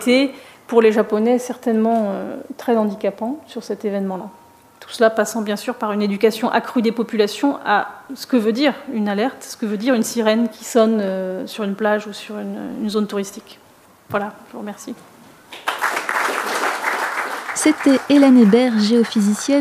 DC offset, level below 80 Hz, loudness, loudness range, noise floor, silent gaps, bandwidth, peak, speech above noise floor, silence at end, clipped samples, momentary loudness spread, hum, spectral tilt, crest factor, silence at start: under 0.1%; -70 dBFS; -19 LUFS; 9 LU; -45 dBFS; none; 15.5 kHz; -2 dBFS; 27 dB; 0 s; under 0.1%; 15 LU; none; -5 dB/octave; 16 dB; 0 s